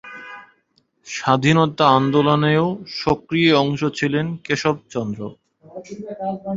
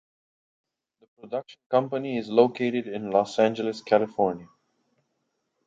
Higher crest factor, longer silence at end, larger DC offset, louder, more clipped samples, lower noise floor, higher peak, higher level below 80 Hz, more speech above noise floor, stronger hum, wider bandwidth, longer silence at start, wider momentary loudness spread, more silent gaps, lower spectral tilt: about the same, 18 dB vs 22 dB; second, 0 s vs 1.2 s; neither; first, -19 LUFS vs -25 LUFS; neither; second, -64 dBFS vs -77 dBFS; about the same, -2 dBFS vs -4 dBFS; first, -54 dBFS vs -72 dBFS; second, 45 dB vs 52 dB; neither; about the same, 7.8 kHz vs 7.8 kHz; second, 0.05 s vs 1.25 s; first, 20 LU vs 13 LU; second, none vs 1.66-1.70 s; about the same, -6 dB/octave vs -6.5 dB/octave